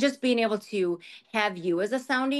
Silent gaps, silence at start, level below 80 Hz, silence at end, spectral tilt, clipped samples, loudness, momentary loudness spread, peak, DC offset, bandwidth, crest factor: none; 0 s; -78 dBFS; 0 s; -4.5 dB/octave; under 0.1%; -27 LUFS; 6 LU; -10 dBFS; under 0.1%; 12.5 kHz; 16 dB